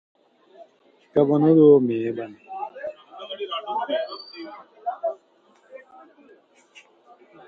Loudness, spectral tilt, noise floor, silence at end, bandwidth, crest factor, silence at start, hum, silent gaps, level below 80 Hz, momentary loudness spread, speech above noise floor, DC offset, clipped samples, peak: -22 LUFS; -9 dB/octave; -59 dBFS; 1.7 s; 5 kHz; 20 dB; 0.6 s; none; none; -72 dBFS; 23 LU; 40 dB; under 0.1%; under 0.1%; -4 dBFS